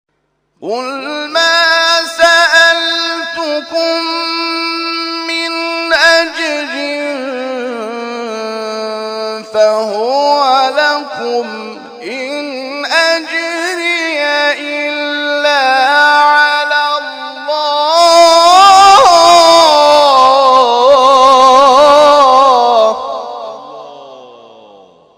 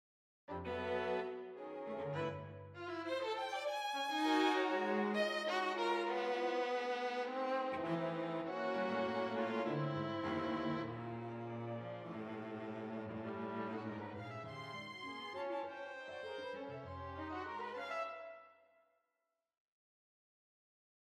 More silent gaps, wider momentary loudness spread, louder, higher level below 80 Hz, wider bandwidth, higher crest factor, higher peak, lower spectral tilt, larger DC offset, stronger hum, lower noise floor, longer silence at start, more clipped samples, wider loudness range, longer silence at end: neither; first, 15 LU vs 11 LU; first, -9 LUFS vs -41 LUFS; first, -52 dBFS vs -76 dBFS; first, 16.5 kHz vs 14.5 kHz; second, 10 dB vs 20 dB; first, 0 dBFS vs -22 dBFS; second, -1 dB/octave vs -5.5 dB/octave; neither; neither; second, -63 dBFS vs -88 dBFS; about the same, 0.6 s vs 0.5 s; first, 0.3% vs under 0.1%; about the same, 9 LU vs 10 LU; second, 0.9 s vs 2.5 s